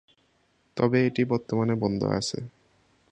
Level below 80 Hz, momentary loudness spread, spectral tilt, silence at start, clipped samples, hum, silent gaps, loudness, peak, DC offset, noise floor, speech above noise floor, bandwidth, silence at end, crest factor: -58 dBFS; 14 LU; -6 dB/octave; 0.75 s; under 0.1%; none; none; -26 LUFS; -8 dBFS; under 0.1%; -68 dBFS; 42 dB; 10 kHz; 0.65 s; 20 dB